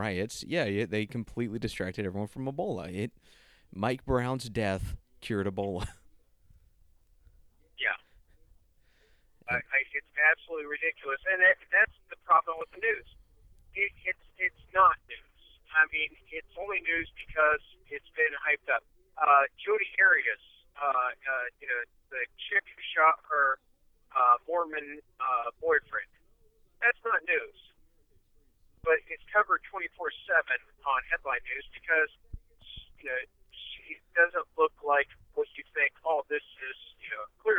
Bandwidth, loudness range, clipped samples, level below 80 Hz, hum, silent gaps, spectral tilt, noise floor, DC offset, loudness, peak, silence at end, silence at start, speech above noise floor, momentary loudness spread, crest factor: 14 kHz; 8 LU; under 0.1%; -56 dBFS; none; none; -5 dB/octave; -65 dBFS; under 0.1%; -29 LUFS; -10 dBFS; 0 s; 0 s; 35 dB; 15 LU; 20 dB